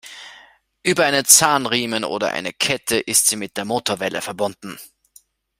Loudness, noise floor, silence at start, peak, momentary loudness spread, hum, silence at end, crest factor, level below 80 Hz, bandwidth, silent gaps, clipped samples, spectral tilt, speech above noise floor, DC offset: -18 LUFS; -54 dBFS; 0.05 s; 0 dBFS; 20 LU; none; 0.75 s; 20 dB; -60 dBFS; 16 kHz; none; under 0.1%; -1.5 dB/octave; 34 dB; under 0.1%